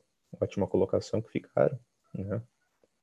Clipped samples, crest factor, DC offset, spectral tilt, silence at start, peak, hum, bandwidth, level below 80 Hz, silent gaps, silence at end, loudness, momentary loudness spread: under 0.1%; 22 dB; under 0.1%; -7.5 dB/octave; 0.35 s; -10 dBFS; none; 9.8 kHz; -58 dBFS; none; 0.6 s; -31 LUFS; 12 LU